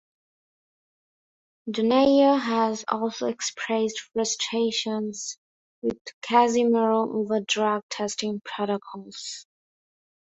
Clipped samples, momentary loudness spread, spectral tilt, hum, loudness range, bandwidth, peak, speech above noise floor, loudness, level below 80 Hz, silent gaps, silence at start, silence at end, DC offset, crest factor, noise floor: under 0.1%; 16 LU; -3.5 dB/octave; none; 4 LU; 8.4 kHz; -6 dBFS; over 66 dB; -24 LUFS; -68 dBFS; 5.38-5.82 s, 6.01-6.05 s, 6.13-6.21 s, 7.83-7.89 s; 1.65 s; 0.95 s; under 0.1%; 20 dB; under -90 dBFS